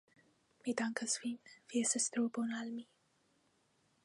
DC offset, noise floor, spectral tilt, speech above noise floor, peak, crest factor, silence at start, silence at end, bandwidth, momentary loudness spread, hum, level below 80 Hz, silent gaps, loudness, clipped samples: under 0.1%; -76 dBFS; -2 dB/octave; 38 dB; -20 dBFS; 20 dB; 0.65 s; 1.2 s; 11.5 kHz; 12 LU; none; under -90 dBFS; none; -38 LUFS; under 0.1%